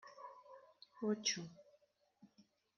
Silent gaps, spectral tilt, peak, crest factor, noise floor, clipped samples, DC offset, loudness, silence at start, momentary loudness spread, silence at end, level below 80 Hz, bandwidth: none; -3 dB/octave; -24 dBFS; 24 dB; -75 dBFS; under 0.1%; under 0.1%; -41 LUFS; 0.05 s; 23 LU; 0.35 s; under -90 dBFS; 7 kHz